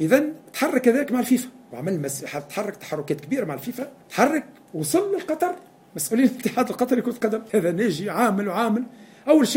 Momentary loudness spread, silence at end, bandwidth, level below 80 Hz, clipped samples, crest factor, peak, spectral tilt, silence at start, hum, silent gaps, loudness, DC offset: 11 LU; 0 s; 16.5 kHz; -68 dBFS; under 0.1%; 20 dB; -4 dBFS; -5 dB/octave; 0 s; none; none; -24 LUFS; under 0.1%